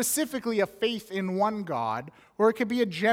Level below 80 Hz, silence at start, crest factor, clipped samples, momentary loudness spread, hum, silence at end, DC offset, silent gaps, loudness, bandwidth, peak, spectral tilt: -68 dBFS; 0 s; 18 dB; under 0.1%; 7 LU; none; 0 s; under 0.1%; none; -28 LUFS; 17 kHz; -10 dBFS; -4 dB/octave